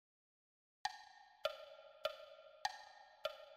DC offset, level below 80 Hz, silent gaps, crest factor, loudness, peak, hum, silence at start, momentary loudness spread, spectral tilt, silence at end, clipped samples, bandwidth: under 0.1%; -84 dBFS; none; 24 dB; -48 LUFS; -26 dBFS; none; 0.85 s; 13 LU; 0.5 dB/octave; 0 s; under 0.1%; 15.5 kHz